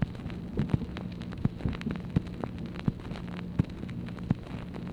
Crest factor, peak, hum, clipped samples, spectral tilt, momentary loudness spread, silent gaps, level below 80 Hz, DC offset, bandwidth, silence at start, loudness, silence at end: 22 dB; -12 dBFS; none; under 0.1%; -8.5 dB/octave; 7 LU; none; -44 dBFS; under 0.1%; 10.5 kHz; 0 s; -35 LUFS; 0 s